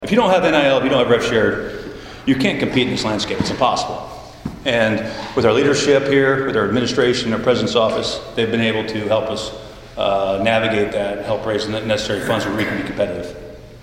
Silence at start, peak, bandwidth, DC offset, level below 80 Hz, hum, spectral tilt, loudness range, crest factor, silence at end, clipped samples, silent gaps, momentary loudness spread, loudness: 0 s; 0 dBFS; 16 kHz; under 0.1%; -44 dBFS; none; -5 dB/octave; 3 LU; 18 dB; 0 s; under 0.1%; none; 13 LU; -18 LUFS